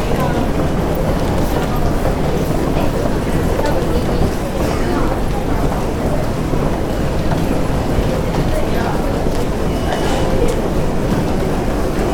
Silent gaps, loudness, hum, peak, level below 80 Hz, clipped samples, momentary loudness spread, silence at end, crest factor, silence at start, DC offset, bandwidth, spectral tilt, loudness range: none; -18 LUFS; none; -2 dBFS; -20 dBFS; under 0.1%; 2 LU; 0 s; 14 dB; 0 s; under 0.1%; 18.5 kHz; -6.5 dB/octave; 1 LU